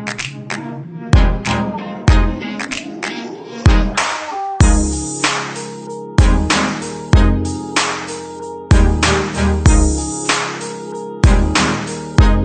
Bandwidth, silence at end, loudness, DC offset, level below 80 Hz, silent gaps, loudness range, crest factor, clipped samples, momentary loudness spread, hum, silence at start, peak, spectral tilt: 9.4 kHz; 0 s; -16 LUFS; under 0.1%; -18 dBFS; none; 3 LU; 14 dB; under 0.1%; 13 LU; none; 0 s; 0 dBFS; -5 dB/octave